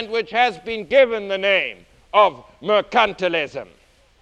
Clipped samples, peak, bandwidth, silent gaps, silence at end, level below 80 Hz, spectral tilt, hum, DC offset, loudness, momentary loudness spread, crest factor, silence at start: under 0.1%; -2 dBFS; 8.8 kHz; none; 0.6 s; -56 dBFS; -4 dB/octave; none; under 0.1%; -19 LUFS; 12 LU; 18 dB; 0 s